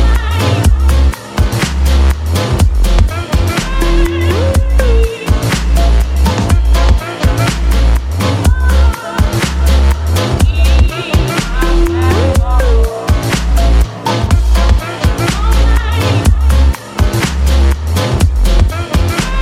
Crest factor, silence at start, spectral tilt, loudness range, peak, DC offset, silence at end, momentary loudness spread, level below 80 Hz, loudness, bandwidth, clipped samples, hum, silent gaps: 10 dB; 0 s; -5.5 dB/octave; 1 LU; 0 dBFS; under 0.1%; 0 s; 4 LU; -12 dBFS; -12 LUFS; 15.5 kHz; under 0.1%; none; none